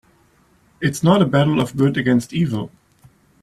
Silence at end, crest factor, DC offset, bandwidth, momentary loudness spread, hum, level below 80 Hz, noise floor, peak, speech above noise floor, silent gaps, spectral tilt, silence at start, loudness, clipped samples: 0.75 s; 18 dB; under 0.1%; 13.5 kHz; 9 LU; none; -52 dBFS; -56 dBFS; -2 dBFS; 39 dB; none; -6.5 dB/octave; 0.8 s; -18 LUFS; under 0.1%